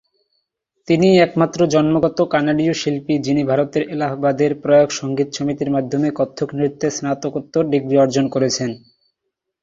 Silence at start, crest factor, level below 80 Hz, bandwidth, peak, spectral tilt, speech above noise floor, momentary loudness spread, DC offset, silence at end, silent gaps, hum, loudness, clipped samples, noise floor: 0.9 s; 16 dB; -56 dBFS; 7.8 kHz; -2 dBFS; -6 dB/octave; 61 dB; 8 LU; under 0.1%; 0.85 s; none; none; -18 LUFS; under 0.1%; -78 dBFS